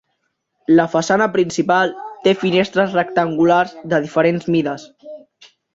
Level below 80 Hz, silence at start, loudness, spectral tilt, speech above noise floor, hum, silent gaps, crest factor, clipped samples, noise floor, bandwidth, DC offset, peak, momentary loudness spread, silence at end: -58 dBFS; 0.7 s; -17 LUFS; -5.5 dB/octave; 55 dB; none; none; 16 dB; under 0.1%; -71 dBFS; 7.8 kHz; under 0.1%; -2 dBFS; 6 LU; 0.6 s